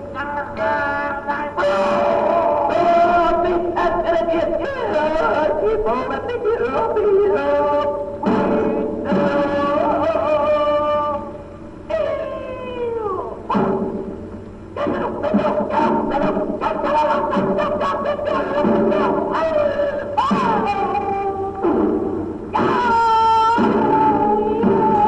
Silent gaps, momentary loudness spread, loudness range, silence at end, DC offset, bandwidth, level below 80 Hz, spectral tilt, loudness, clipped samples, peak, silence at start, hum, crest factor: none; 9 LU; 5 LU; 0 s; under 0.1%; 9.8 kHz; -42 dBFS; -7 dB/octave; -19 LUFS; under 0.1%; -4 dBFS; 0 s; none; 14 dB